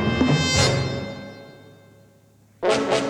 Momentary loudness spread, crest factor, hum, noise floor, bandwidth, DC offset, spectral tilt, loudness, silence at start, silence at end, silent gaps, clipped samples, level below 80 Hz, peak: 20 LU; 20 dB; none; -55 dBFS; 15.5 kHz; under 0.1%; -4.5 dB/octave; -21 LUFS; 0 s; 0 s; none; under 0.1%; -44 dBFS; -4 dBFS